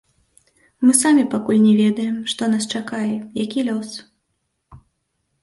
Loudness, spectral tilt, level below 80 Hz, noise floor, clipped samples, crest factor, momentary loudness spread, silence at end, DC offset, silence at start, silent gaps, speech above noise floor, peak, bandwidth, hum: -18 LUFS; -4 dB/octave; -60 dBFS; -73 dBFS; under 0.1%; 20 dB; 11 LU; 0.65 s; under 0.1%; 0.8 s; none; 55 dB; 0 dBFS; 12 kHz; none